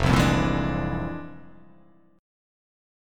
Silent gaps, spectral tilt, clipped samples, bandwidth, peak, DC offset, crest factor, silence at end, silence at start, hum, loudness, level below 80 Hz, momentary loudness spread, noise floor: none; -6 dB/octave; under 0.1%; 16.5 kHz; -6 dBFS; under 0.1%; 22 dB; 0.95 s; 0 s; none; -25 LUFS; -36 dBFS; 17 LU; -57 dBFS